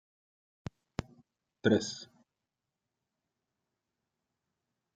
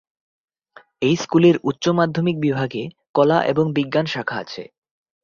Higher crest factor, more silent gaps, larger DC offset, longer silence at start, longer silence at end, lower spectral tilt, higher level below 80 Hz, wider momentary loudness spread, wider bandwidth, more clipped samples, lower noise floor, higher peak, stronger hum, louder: first, 26 dB vs 18 dB; second, none vs 3.09-3.14 s; neither; about the same, 1 s vs 1 s; first, 2.9 s vs 0.6 s; second, -5 dB/octave vs -6.5 dB/octave; second, -66 dBFS vs -60 dBFS; first, 20 LU vs 12 LU; first, 9.2 kHz vs 7.4 kHz; neither; first, -88 dBFS vs -51 dBFS; second, -14 dBFS vs -2 dBFS; neither; second, -33 LUFS vs -19 LUFS